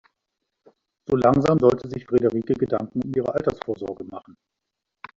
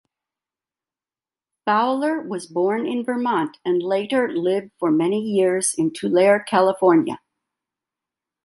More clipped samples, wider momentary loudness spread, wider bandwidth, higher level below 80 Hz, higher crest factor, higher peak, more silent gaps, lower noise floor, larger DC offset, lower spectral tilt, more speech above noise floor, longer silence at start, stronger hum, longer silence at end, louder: neither; first, 17 LU vs 7 LU; second, 7.6 kHz vs 11.5 kHz; first, -54 dBFS vs -70 dBFS; about the same, 20 dB vs 18 dB; about the same, -4 dBFS vs -4 dBFS; neither; second, -83 dBFS vs under -90 dBFS; neither; first, -8.5 dB/octave vs -4.5 dB/octave; second, 61 dB vs over 70 dB; second, 1.1 s vs 1.65 s; neither; second, 0.85 s vs 1.3 s; about the same, -22 LUFS vs -20 LUFS